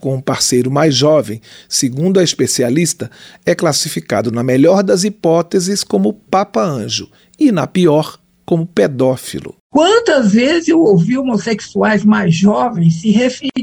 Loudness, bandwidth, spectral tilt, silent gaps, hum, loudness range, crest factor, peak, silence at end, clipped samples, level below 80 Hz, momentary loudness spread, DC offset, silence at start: -13 LUFS; 16 kHz; -5 dB/octave; 9.60-9.70 s; none; 3 LU; 12 dB; -2 dBFS; 0 s; under 0.1%; -52 dBFS; 8 LU; under 0.1%; 0.05 s